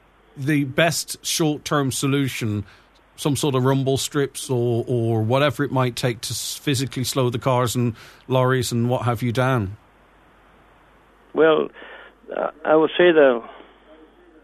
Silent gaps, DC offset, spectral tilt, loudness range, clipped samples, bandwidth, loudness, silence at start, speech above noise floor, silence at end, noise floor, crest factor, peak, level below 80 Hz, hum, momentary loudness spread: none; under 0.1%; -5 dB/octave; 4 LU; under 0.1%; 14 kHz; -21 LUFS; 0.35 s; 33 dB; 0.85 s; -53 dBFS; 20 dB; -2 dBFS; -56 dBFS; none; 10 LU